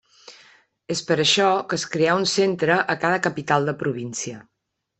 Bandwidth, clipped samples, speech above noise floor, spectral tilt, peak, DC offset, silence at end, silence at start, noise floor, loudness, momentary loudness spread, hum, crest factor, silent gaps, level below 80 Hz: 8.6 kHz; under 0.1%; 33 dB; -3.5 dB/octave; -4 dBFS; under 0.1%; 0.55 s; 0.3 s; -55 dBFS; -21 LUFS; 11 LU; none; 18 dB; none; -64 dBFS